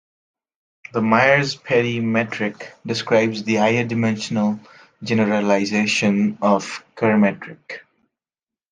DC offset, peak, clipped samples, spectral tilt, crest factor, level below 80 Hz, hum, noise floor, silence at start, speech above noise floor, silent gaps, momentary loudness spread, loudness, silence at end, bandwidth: under 0.1%; -2 dBFS; under 0.1%; -5.5 dB/octave; 18 dB; -64 dBFS; none; under -90 dBFS; 0.95 s; over 71 dB; none; 15 LU; -19 LUFS; 0.9 s; 9.4 kHz